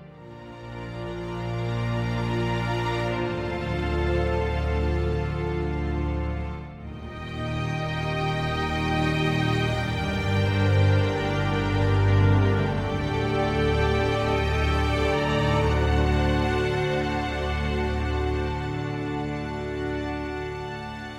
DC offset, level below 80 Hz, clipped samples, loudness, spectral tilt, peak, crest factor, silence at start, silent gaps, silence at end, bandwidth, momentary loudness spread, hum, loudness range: under 0.1%; -32 dBFS; under 0.1%; -25 LUFS; -7 dB/octave; -10 dBFS; 16 dB; 0 s; none; 0 s; 11 kHz; 10 LU; none; 6 LU